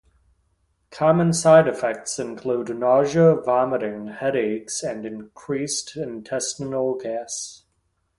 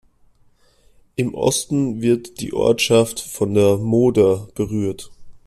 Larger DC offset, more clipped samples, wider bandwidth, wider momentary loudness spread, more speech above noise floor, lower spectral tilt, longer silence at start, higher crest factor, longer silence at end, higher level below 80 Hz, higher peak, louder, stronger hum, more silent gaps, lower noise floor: neither; neither; second, 11.5 kHz vs 14.5 kHz; first, 15 LU vs 10 LU; first, 49 dB vs 37 dB; about the same, -5 dB/octave vs -5 dB/octave; second, 0.9 s vs 1.2 s; about the same, 20 dB vs 16 dB; first, 0.65 s vs 0.1 s; second, -60 dBFS vs -50 dBFS; about the same, -2 dBFS vs -4 dBFS; second, -22 LUFS vs -19 LUFS; neither; neither; first, -70 dBFS vs -55 dBFS